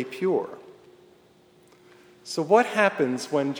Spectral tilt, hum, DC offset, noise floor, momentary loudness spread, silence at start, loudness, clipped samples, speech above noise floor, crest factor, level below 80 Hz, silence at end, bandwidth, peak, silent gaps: -5 dB/octave; none; under 0.1%; -57 dBFS; 19 LU; 0 s; -24 LUFS; under 0.1%; 33 dB; 22 dB; -78 dBFS; 0 s; over 20 kHz; -6 dBFS; none